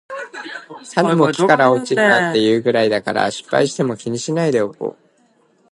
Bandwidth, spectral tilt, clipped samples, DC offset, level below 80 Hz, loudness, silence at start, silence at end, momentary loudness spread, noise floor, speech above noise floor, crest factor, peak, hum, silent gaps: 11.5 kHz; -5 dB/octave; under 0.1%; under 0.1%; -64 dBFS; -16 LUFS; 0.1 s; 0.8 s; 16 LU; -57 dBFS; 41 dB; 18 dB; 0 dBFS; none; none